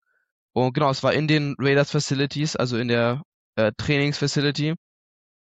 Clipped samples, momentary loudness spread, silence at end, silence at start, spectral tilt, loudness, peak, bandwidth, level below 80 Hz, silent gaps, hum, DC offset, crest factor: under 0.1%; 6 LU; 0.65 s; 0.55 s; -5.5 dB/octave; -23 LUFS; -8 dBFS; 8.6 kHz; -56 dBFS; 3.25-3.53 s; none; under 0.1%; 16 dB